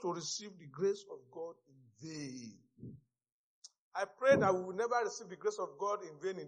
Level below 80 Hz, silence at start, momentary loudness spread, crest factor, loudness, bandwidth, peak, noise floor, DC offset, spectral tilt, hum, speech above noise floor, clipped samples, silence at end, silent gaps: -80 dBFS; 0 s; 23 LU; 22 dB; -36 LUFS; 9.4 kHz; -16 dBFS; -63 dBFS; under 0.1%; -4.5 dB/octave; none; 27 dB; under 0.1%; 0 s; 3.32-3.62 s, 3.78-3.92 s